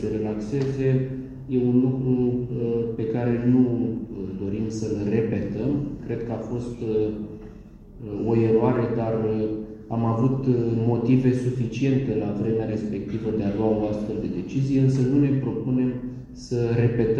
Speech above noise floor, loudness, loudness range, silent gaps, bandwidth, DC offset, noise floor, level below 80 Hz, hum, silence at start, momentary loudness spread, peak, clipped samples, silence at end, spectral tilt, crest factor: 20 dB; -24 LUFS; 4 LU; none; 8.4 kHz; under 0.1%; -43 dBFS; -46 dBFS; none; 0 s; 10 LU; -6 dBFS; under 0.1%; 0 s; -9 dB/octave; 18 dB